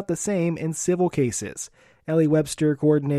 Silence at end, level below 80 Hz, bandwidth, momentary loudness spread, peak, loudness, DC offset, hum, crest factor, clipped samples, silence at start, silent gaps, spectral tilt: 0 s; -58 dBFS; 14.5 kHz; 14 LU; -8 dBFS; -23 LUFS; under 0.1%; none; 14 dB; under 0.1%; 0 s; none; -6 dB/octave